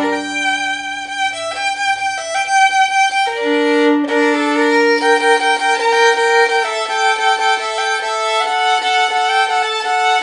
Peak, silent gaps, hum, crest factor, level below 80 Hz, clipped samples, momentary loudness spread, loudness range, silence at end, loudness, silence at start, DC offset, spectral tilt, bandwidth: -2 dBFS; none; none; 14 dB; -60 dBFS; under 0.1%; 7 LU; 3 LU; 0 s; -14 LUFS; 0 s; under 0.1%; -0.5 dB/octave; 11 kHz